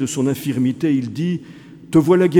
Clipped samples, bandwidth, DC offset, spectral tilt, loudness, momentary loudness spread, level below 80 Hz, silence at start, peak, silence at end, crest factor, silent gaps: under 0.1%; 17.5 kHz; under 0.1%; -6.5 dB/octave; -19 LUFS; 9 LU; -54 dBFS; 0 s; 0 dBFS; 0 s; 16 dB; none